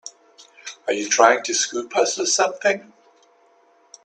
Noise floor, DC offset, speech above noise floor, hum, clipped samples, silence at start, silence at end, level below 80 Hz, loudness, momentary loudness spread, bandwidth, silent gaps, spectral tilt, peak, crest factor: -57 dBFS; under 0.1%; 37 dB; none; under 0.1%; 0.05 s; 1.2 s; -72 dBFS; -20 LUFS; 19 LU; 10.5 kHz; none; -0.5 dB/octave; 0 dBFS; 22 dB